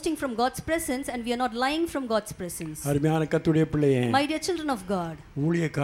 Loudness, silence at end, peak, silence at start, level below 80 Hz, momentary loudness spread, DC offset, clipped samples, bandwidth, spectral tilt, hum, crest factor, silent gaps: -27 LUFS; 0 s; -10 dBFS; 0 s; -52 dBFS; 7 LU; under 0.1%; under 0.1%; 16.5 kHz; -5.5 dB/octave; none; 16 dB; none